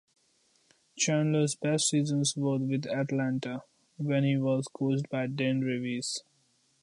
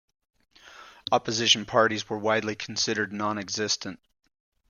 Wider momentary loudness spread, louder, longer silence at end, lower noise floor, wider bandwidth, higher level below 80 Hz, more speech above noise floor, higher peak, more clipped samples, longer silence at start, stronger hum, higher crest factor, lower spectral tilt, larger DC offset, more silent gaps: about the same, 8 LU vs 9 LU; second, -30 LUFS vs -25 LUFS; second, 0.6 s vs 0.75 s; first, -70 dBFS vs -50 dBFS; about the same, 11.5 kHz vs 11 kHz; second, -76 dBFS vs -66 dBFS; first, 41 dB vs 23 dB; second, -14 dBFS vs -6 dBFS; neither; first, 0.95 s vs 0.65 s; neither; second, 16 dB vs 22 dB; first, -5 dB/octave vs -2.5 dB/octave; neither; neither